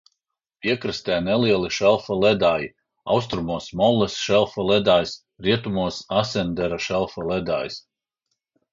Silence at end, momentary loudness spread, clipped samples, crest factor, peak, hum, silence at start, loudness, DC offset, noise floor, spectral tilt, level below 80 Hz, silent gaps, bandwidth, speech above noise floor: 0.95 s; 8 LU; under 0.1%; 18 dB; -4 dBFS; none; 0.65 s; -22 LUFS; under 0.1%; -78 dBFS; -5 dB/octave; -50 dBFS; none; 7.6 kHz; 57 dB